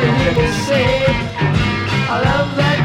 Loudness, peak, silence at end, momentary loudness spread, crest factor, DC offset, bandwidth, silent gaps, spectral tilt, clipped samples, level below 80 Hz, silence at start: -16 LUFS; 0 dBFS; 0 s; 3 LU; 14 dB; under 0.1%; 13 kHz; none; -6 dB/octave; under 0.1%; -30 dBFS; 0 s